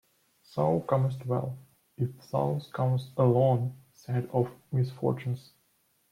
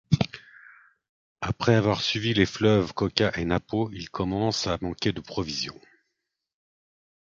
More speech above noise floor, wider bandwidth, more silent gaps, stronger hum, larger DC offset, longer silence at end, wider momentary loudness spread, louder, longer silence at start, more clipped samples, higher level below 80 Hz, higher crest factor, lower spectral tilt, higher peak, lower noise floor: second, 42 dB vs 57 dB; first, 11.5 kHz vs 7.6 kHz; second, none vs 1.09-1.36 s; neither; neither; second, 0.7 s vs 1.55 s; about the same, 12 LU vs 10 LU; second, -30 LUFS vs -26 LUFS; first, 0.55 s vs 0.1 s; neither; second, -66 dBFS vs -48 dBFS; second, 18 dB vs 26 dB; first, -9.5 dB/octave vs -5.5 dB/octave; second, -12 dBFS vs -2 dBFS; second, -71 dBFS vs -82 dBFS